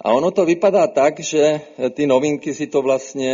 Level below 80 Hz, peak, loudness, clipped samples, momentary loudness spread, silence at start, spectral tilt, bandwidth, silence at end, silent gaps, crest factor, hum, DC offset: -62 dBFS; -2 dBFS; -18 LUFS; under 0.1%; 7 LU; 0.05 s; -4.5 dB/octave; 7.6 kHz; 0 s; none; 14 dB; none; under 0.1%